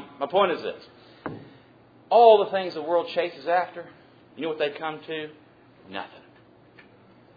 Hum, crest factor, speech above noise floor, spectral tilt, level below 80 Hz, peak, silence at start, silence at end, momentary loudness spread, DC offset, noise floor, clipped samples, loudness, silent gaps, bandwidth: none; 22 dB; 31 dB; -6.5 dB/octave; -74 dBFS; -4 dBFS; 0 s; 1.3 s; 24 LU; under 0.1%; -54 dBFS; under 0.1%; -23 LUFS; none; 5 kHz